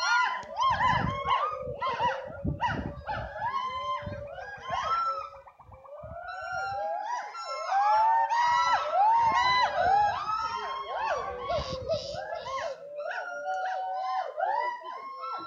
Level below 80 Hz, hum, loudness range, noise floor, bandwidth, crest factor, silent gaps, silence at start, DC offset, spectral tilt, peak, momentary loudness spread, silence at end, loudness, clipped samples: -52 dBFS; none; 9 LU; -51 dBFS; 7.6 kHz; 16 dB; none; 0 s; under 0.1%; -4 dB/octave; -14 dBFS; 14 LU; 0 s; -29 LUFS; under 0.1%